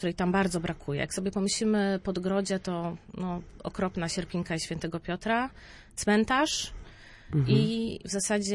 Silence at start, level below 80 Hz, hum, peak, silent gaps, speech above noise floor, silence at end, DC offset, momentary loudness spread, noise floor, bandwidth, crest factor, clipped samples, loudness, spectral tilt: 0 s; -52 dBFS; none; -10 dBFS; none; 19 dB; 0 s; under 0.1%; 11 LU; -48 dBFS; 11.5 kHz; 18 dB; under 0.1%; -29 LUFS; -5 dB/octave